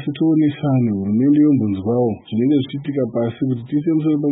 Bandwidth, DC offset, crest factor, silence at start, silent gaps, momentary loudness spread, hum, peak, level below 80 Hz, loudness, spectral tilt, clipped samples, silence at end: 3.9 kHz; under 0.1%; 12 dB; 0 s; none; 7 LU; none; -6 dBFS; -58 dBFS; -18 LUFS; -13.5 dB/octave; under 0.1%; 0 s